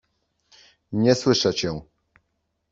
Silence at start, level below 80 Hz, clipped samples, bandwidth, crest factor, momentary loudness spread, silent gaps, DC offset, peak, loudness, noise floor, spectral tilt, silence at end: 0.9 s; -56 dBFS; under 0.1%; 7.8 kHz; 22 dB; 12 LU; none; under 0.1%; -4 dBFS; -22 LUFS; -75 dBFS; -5 dB/octave; 0.9 s